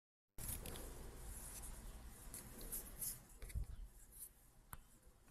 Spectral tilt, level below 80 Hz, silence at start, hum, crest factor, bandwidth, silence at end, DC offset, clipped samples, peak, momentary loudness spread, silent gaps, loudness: -3 dB/octave; -56 dBFS; 0.4 s; none; 20 dB; 15.5 kHz; 0 s; under 0.1%; under 0.1%; -32 dBFS; 13 LU; none; -52 LUFS